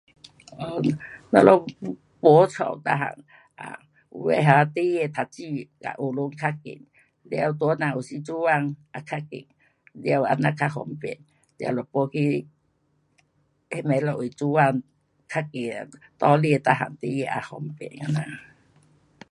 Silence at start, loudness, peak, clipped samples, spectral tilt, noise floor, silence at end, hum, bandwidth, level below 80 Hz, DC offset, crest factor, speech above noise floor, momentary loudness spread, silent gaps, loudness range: 0.5 s; -24 LUFS; 0 dBFS; under 0.1%; -7.5 dB/octave; -68 dBFS; 0.9 s; none; 11.5 kHz; -66 dBFS; under 0.1%; 24 dB; 45 dB; 19 LU; none; 7 LU